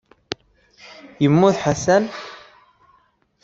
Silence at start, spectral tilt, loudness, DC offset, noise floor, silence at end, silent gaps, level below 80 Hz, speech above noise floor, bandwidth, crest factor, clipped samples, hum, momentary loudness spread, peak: 1.2 s; -6 dB/octave; -18 LUFS; under 0.1%; -60 dBFS; 1.05 s; none; -54 dBFS; 43 dB; 8 kHz; 20 dB; under 0.1%; none; 23 LU; -2 dBFS